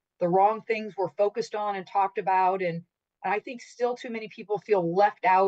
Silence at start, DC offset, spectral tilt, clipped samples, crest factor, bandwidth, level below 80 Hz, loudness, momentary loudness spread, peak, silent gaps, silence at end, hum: 0.2 s; under 0.1%; -6 dB/octave; under 0.1%; 16 dB; 8.2 kHz; -82 dBFS; -27 LUFS; 12 LU; -10 dBFS; none; 0 s; none